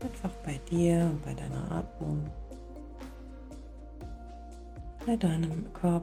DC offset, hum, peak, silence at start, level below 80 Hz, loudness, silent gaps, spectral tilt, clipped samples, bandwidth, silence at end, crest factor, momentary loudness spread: under 0.1%; none; -14 dBFS; 0 s; -46 dBFS; -32 LUFS; none; -7.5 dB/octave; under 0.1%; 12.5 kHz; 0 s; 18 dB; 19 LU